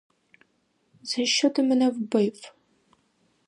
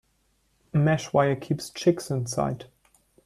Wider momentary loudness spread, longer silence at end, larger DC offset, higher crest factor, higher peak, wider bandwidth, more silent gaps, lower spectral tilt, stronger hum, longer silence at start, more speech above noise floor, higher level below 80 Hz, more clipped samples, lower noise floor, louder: first, 14 LU vs 8 LU; first, 1 s vs 0.6 s; neither; about the same, 18 dB vs 18 dB; about the same, -8 dBFS vs -8 dBFS; second, 11 kHz vs 13.5 kHz; neither; second, -3.5 dB/octave vs -6 dB/octave; neither; first, 1.05 s vs 0.75 s; about the same, 46 dB vs 44 dB; second, -80 dBFS vs -58 dBFS; neither; about the same, -70 dBFS vs -69 dBFS; about the same, -24 LUFS vs -26 LUFS